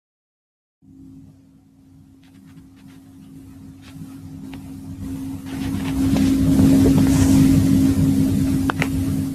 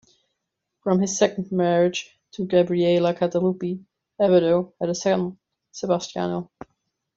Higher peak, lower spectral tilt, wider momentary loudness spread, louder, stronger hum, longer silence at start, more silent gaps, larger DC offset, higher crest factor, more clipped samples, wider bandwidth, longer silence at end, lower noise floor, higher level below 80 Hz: about the same, -4 dBFS vs -4 dBFS; first, -7 dB/octave vs -5.5 dB/octave; first, 22 LU vs 13 LU; first, -18 LUFS vs -23 LUFS; neither; first, 1.15 s vs 0.85 s; neither; neither; about the same, 16 dB vs 18 dB; neither; first, 14.5 kHz vs 7.8 kHz; second, 0 s vs 0.7 s; second, -50 dBFS vs -81 dBFS; first, -36 dBFS vs -64 dBFS